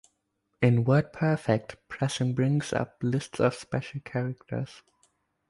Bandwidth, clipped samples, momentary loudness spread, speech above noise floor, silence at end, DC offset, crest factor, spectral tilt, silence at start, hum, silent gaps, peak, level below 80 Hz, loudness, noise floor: 11.5 kHz; under 0.1%; 11 LU; 50 dB; 0.75 s; under 0.1%; 20 dB; -7 dB/octave; 0.6 s; none; none; -8 dBFS; -60 dBFS; -28 LUFS; -77 dBFS